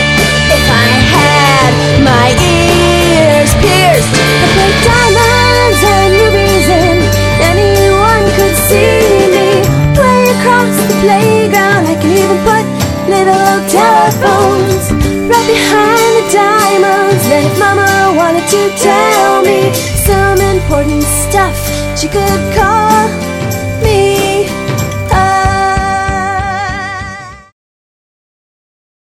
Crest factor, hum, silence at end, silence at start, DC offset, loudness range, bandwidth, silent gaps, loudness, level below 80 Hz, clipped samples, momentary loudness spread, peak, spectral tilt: 8 dB; none; 1.7 s; 0 s; 0.1%; 4 LU; 17 kHz; none; -8 LUFS; -24 dBFS; 0.8%; 7 LU; 0 dBFS; -4.5 dB/octave